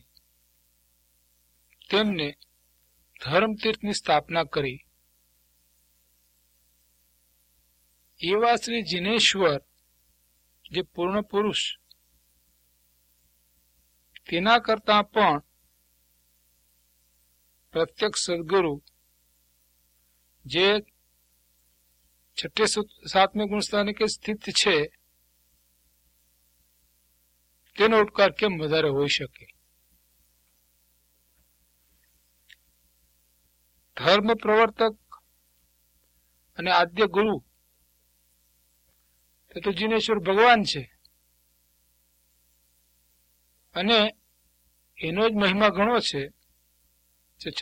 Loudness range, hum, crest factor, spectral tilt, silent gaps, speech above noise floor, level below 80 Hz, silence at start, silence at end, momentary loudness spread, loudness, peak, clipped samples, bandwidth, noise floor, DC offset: 6 LU; 60 Hz at -60 dBFS; 24 dB; -3.5 dB/octave; none; 43 dB; -60 dBFS; 1.9 s; 0 s; 13 LU; -24 LUFS; -4 dBFS; under 0.1%; 16.5 kHz; -67 dBFS; under 0.1%